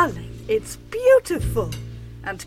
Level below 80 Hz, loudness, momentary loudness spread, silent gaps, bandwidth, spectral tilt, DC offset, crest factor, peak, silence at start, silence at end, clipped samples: -38 dBFS; -21 LUFS; 17 LU; none; 16 kHz; -5.5 dB/octave; under 0.1%; 16 dB; -4 dBFS; 0 s; 0 s; under 0.1%